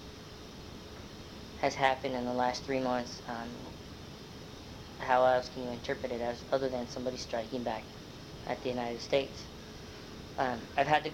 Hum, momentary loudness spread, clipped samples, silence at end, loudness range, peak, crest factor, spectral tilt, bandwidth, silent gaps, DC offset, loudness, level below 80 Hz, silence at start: none; 18 LU; under 0.1%; 0 s; 4 LU; -12 dBFS; 24 dB; -4.5 dB/octave; 16.5 kHz; none; under 0.1%; -33 LUFS; -56 dBFS; 0 s